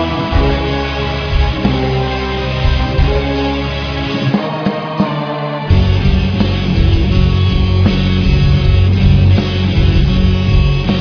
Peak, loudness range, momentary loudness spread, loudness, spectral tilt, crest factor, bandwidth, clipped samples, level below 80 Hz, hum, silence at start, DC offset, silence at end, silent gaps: 0 dBFS; 4 LU; 6 LU; -14 LUFS; -7.5 dB/octave; 12 dB; 5.4 kHz; under 0.1%; -18 dBFS; none; 0 s; under 0.1%; 0 s; none